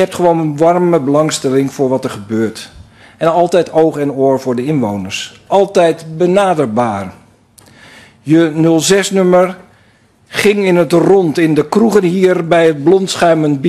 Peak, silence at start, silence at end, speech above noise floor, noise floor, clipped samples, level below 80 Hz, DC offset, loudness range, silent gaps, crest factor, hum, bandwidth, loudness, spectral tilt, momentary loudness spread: 0 dBFS; 0 s; 0 s; 38 dB; -49 dBFS; under 0.1%; -52 dBFS; under 0.1%; 4 LU; none; 12 dB; none; 13.5 kHz; -12 LUFS; -5.5 dB/octave; 8 LU